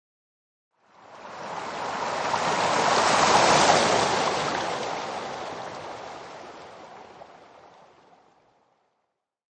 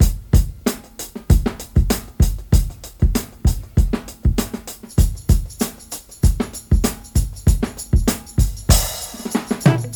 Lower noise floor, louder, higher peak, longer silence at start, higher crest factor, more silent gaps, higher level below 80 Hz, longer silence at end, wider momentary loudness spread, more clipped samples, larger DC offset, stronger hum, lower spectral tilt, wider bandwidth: first, -79 dBFS vs -36 dBFS; second, -23 LUFS vs -20 LUFS; second, -6 dBFS vs 0 dBFS; first, 1.1 s vs 0 s; about the same, 22 dB vs 18 dB; neither; second, -60 dBFS vs -20 dBFS; first, 2.1 s vs 0 s; first, 25 LU vs 8 LU; neither; neither; neither; second, -2.5 dB/octave vs -5.5 dB/octave; second, 10 kHz vs over 20 kHz